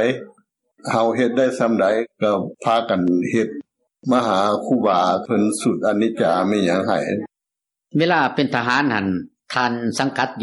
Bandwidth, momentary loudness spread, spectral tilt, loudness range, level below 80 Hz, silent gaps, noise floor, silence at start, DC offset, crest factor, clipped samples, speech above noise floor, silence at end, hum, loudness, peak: 12 kHz; 8 LU; -5.5 dB/octave; 2 LU; -68 dBFS; none; -85 dBFS; 0 s; under 0.1%; 16 dB; under 0.1%; 66 dB; 0 s; none; -19 LUFS; -4 dBFS